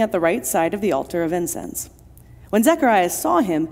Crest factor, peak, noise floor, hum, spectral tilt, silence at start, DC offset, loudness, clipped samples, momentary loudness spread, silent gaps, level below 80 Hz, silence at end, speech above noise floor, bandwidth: 16 dB; -4 dBFS; -45 dBFS; none; -4.5 dB/octave; 0 s; under 0.1%; -20 LUFS; under 0.1%; 11 LU; none; -50 dBFS; 0 s; 25 dB; 16 kHz